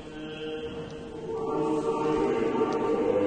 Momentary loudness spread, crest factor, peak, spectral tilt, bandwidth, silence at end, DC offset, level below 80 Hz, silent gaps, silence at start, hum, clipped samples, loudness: 12 LU; 14 dB; -14 dBFS; -6.5 dB/octave; 9.4 kHz; 0 s; under 0.1%; -54 dBFS; none; 0 s; none; under 0.1%; -29 LUFS